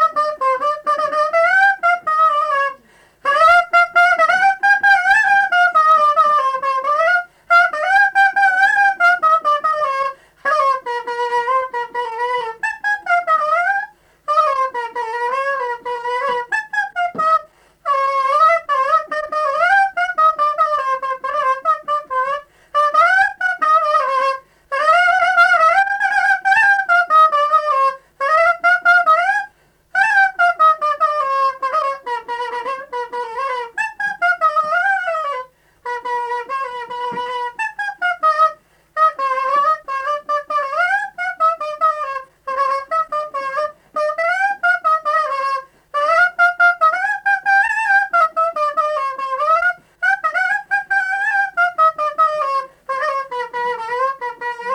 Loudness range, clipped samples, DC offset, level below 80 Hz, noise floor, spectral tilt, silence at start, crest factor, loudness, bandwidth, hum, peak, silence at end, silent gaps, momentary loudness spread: 7 LU; under 0.1%; under 0.1%; -60 dBFS; -50 dBFS; -1 dB/octave; 0 s; 12 dB; -16 LUFS; 12.5 kHz; none; -4 dBFS; 0 s; none; 11 LU